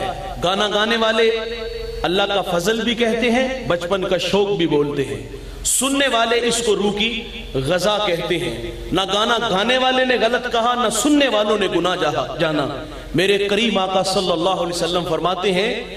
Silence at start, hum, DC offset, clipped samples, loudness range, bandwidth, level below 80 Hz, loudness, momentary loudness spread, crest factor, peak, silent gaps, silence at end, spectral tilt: 0 s; none; under 0.1%; under 0.1%; 2 LU; 15 kHz; -40 dBFS; -18 LUFS; 8 LU; 16 dB; -4 dBFS; none; 0 s; -3.5 dB/octave